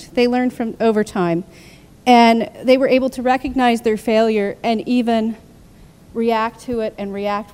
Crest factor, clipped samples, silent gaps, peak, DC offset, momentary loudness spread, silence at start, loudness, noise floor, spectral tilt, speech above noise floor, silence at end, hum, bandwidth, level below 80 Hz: 18 dB; under 0.1%; none; 0 dBFS; under 0.1%; 10 LU; 0 s; -17 LUFS; -44 dBFS; -5.5 dB/octave; 28 dB; 0.1 s; none; 15 kHz; -48 dBFS